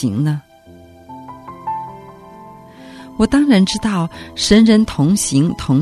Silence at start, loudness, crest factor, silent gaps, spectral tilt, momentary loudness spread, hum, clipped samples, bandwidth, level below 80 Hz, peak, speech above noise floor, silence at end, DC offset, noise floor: 0 s; -15 LUFS; 16 dB; none; -5.5 dB/octave; 23 LU; none; under 0.1%; 14 kHz; -40 dBFS; 0 dBFS; 29 dB; 0 s; under 0.1%; -42 dBFS